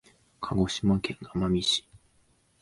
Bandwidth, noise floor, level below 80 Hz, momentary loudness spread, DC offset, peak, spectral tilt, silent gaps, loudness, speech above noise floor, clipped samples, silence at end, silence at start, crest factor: 11.5 kHz; -66 dBFS; -48 dBFS; 7 LU; under 0.1%; -12 dBFS; -5 dB/octave; none; -28 LUFS; 39 dB; under 0.1%; 0.65 s; 0.4 s; 18 dB